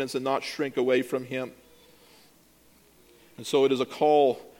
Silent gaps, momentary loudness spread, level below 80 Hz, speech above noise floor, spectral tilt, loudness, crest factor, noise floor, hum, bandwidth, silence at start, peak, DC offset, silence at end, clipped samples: none; 13 LU; -72 dBFS; 33 dB; -4.5 dB/octave; -26 LUFS; 18 dB; -59 dBFS; none; 17 kHz; 0 s; -10 dBFS; under 0.1%; 0.1 s; under 0.1%